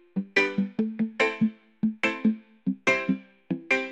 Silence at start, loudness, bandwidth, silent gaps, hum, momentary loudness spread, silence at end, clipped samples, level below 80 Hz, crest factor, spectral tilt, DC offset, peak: 0.15 s; -27 LUFS; 9 kHz; none; none; 9 LU; 0 s; under 0.1%; -68 dBFS; 20 dB; -5.5 dB/octave; under 0.1%; -6 dBFS